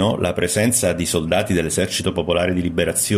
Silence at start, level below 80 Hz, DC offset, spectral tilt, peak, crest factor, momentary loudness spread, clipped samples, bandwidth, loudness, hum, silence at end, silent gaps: 0 s; -42 dBFS; under 0.1%; -4 dB/octave; -4 dBFS; 16 dB; 4 LU; under 0.1%; 15 kHz; -19 LUFS; none; 0 s; none